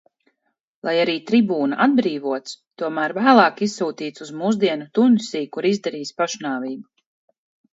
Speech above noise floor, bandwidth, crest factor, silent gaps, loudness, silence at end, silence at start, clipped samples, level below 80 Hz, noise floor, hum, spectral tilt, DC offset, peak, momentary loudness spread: 55 dB; 8 kHz; 20 dB; 2.67-2.71 s; -20 LUFS; 0.9 s; 0.85 s; under 0.1%; -72 dBFS; -75 dBFS; none; -5 dB/octave; under 0.1%; 0 dBFS; 14 LU